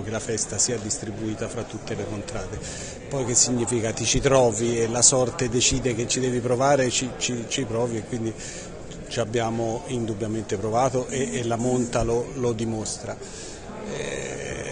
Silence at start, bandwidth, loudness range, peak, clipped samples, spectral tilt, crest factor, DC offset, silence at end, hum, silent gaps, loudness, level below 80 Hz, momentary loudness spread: 0 s; 10 kHz; 7 LU; -2 dBFS; under 0.1%; -3.5 dB/octave; 24 dB; under 0.1%; 0 s; none; none; -24 LUFS; -44 dBFS; 14 LU